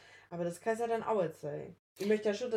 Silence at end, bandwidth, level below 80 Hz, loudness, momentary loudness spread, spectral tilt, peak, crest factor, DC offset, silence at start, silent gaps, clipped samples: 0 s; 15 kHz; -76 dBFS; -35 LUFS; 13 LU; -5.5 dB/octave; -20 dBFS; 16 dB; under 0.1%; 0.05 s; 1.79-1.96 s; under 0.1%